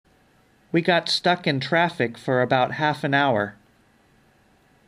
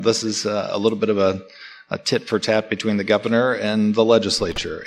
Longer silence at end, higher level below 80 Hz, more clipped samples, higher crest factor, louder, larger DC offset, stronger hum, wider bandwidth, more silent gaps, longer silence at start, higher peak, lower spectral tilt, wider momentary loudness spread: first, 1.35 s vs 0 s; second, -66 dBFS vs -50 dBFS; neither; about the same, 20 dB vs 18 dB; about the same, -22 LUFS vs -20 LUFS; neither; neither; first, 15 kHz vs 12.5 kHz; neither; first, 0.75 s vs 0 s; about the same, -4 dBFS vs -2 dBFS; about the same, -5.5 dB/octave vs -4.5 dB/octave; second, 6 LU vs 9 LU